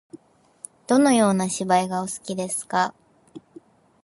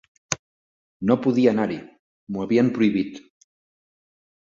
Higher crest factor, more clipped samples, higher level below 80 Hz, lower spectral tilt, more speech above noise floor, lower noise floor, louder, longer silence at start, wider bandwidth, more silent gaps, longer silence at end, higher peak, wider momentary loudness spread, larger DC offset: about the same, 18 dB vs 22 dB; neither; second, -68 dBFS vs -60 dBFS; about the same, -4.5 dB/octave vs -5.5 dB/octave; second, 29 dB vs over 69 dB; second, -50 dBFS vs under -90 dBFS; about the same, -22 LUFS vs -23 LUFS; second, 0.15 s vs 0.3 s; first, 11.5 kHz vs 7.8 kHz; second, none vs 0.39-1.00 s, 1.99-2.27 s; second, 0.65 s vs 1.3 s; about the same, -6 dBFS vs -4 dBFS; first, 17 LU vs 12 LU; neither